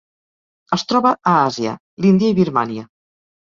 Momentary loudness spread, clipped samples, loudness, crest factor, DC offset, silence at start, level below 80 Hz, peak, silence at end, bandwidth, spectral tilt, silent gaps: 10 LU; under 0.1%; -17 LUFS; 16 dB; under 0.1%; 0.7 s; -56 dBFS; -2 dBFS; 0.7 s; 7.4 kHz; -6.5 dB/octave; 1.80-1.97 s